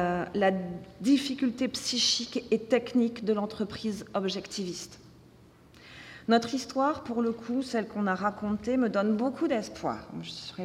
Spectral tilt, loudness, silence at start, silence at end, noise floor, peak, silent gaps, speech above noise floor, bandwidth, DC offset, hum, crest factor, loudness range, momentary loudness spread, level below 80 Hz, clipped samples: -4 dB/octave; -29 LUFS; 0 s; 0 s; -56 dBFS; -10 dBFS; none; 27 dB; 14.5 kHz; under 0.1%; none; 20 dB; 5 LU; 12 LU; -62 dBFS; under 0.1%